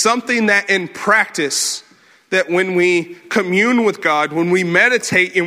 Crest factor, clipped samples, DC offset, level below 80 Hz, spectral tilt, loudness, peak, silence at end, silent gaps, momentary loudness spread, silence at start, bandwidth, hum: 16 dB; under 0.1%; under 0.1%; -64 dBFS; -3.5 dB/octave; -15 LUFS; 0 dBFS; 0 s; none; 7 LU; 0 s; 16 kHz; none